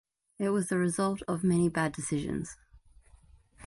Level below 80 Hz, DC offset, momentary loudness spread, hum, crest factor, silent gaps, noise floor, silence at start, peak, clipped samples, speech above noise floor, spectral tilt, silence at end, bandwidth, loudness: -58 dBFS; under 0.1%; 9 LU; none; 16 dB; none; -59 dBFS; 0.4 s; -16 dBFS; under 0.1%; 29 dB; -6 dB/octave; 0 s; 11.5 kHz; -30 LUFS